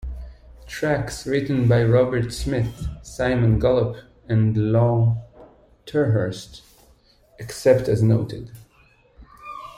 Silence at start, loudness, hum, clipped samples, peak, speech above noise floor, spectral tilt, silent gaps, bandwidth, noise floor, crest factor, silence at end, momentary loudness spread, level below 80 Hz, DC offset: 0 s; -21 LUFS; none; under 0.1%; -2 dBFS; 36 dB; -7.5 dB/octave; none; 13.5 kHz; -56 dBFS; 20 dB; 0.05 s; 19 LU; -40 dBFS; under 0.1%